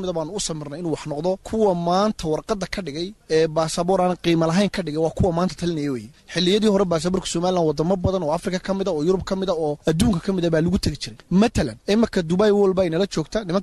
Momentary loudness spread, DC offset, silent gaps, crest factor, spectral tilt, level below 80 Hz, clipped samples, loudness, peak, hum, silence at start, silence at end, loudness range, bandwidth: 8 LU; under 0.1%; none; 14 dB; -5.5 dB/octave; -40 dBFS; under 0.1%; -22 LUFS; -6 dBFS; none; 0 s; 0 s; 2 LU; 12.5 kHz